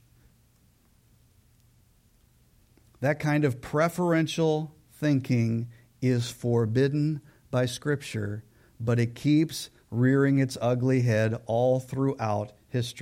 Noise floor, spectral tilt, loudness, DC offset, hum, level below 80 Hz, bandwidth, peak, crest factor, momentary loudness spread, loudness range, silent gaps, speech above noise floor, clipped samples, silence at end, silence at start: -63 dBFS; -7 dB/octave; -27 LUFS; under 0.1%; none; -62 dBFS; 16 kHz; -12 dBFS; 14 dB; 9 LU; 5 LU; none; 37 dB; under 0.1%; 0 s; 3 s